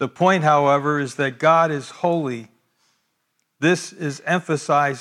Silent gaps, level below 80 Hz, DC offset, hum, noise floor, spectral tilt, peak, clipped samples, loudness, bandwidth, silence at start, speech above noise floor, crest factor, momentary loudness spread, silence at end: none; -74 dBFS; under 0.1%; none; -72 dBFS; -5.5 dB/octave; -4 dBFS; under 0.1%; -20 LUFS; 12.5 kHz; 0 s; 52 dB; 16 dB; 9 LU; 0 s